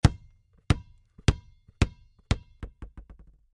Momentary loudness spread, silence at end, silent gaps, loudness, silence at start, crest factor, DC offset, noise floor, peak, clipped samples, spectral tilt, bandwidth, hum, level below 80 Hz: 20 LU; 0.55 s; none; -30 LUFS; 0.05 s; 26 dB; under 0.1%; -57 dBFS; -2 dBFS; under 0.1%; -6 dB/octave; 11.5 kHz; none; -34 dBFS